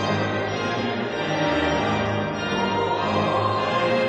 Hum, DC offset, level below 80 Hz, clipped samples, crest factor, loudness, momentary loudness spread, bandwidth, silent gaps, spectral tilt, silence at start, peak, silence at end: none; under 0.1%; -48 dBFS; under 0.1%; 12 dB; -23 LUFS; 3 LU; 9.4 kHz; none; -5.5 dB/octave; 0 s; -10 dBFS; 0 s